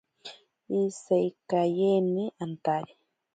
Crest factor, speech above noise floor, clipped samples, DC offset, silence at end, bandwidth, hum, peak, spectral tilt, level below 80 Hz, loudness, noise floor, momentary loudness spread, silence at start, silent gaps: 16 dB; 22 dB; under 0.1%; under 0.1%; 0.5 s; 9.2 kHz; none; -14 dBFS; -7 dB/octave; -76 dBFS; -28 LUFS; -49 dBFS; 21 LU; 0.25 s; none